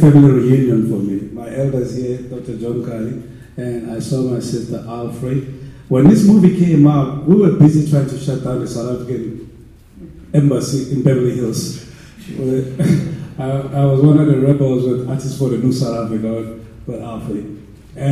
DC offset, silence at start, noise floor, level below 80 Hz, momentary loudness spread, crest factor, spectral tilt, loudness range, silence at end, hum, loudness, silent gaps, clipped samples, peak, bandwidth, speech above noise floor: under 0.1%; 0 s; -40 dBFS; -44 dBFS; 16 LU; 14 dB; -8 dB/octave; 10 LU; 0 s; none; -15 LUFS; none; under 0.1%; 0 dBFS; 13 kHz; 26 dB